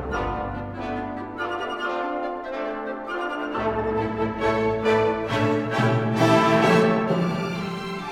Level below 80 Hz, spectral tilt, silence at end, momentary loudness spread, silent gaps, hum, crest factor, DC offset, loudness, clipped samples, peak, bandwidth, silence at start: -44 dBFS; -6.5 dB/octave; 0 s; 12 LU; none; none; 18 dB; under 0.1%; -24 LUFS; under 0.1%; -4 dBFS; 15.5 kHz; 0 s